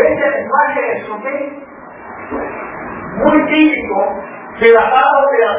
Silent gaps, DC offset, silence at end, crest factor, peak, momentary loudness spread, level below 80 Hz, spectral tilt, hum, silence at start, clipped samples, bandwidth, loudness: none; under 0.1%; 0 s; 14 dB; 0 dBFS; 19 LU; -46 dBFS; -8.5 dB/octave; none; 0 s; under 0.1%; 3.8 kHz; -13 LUFS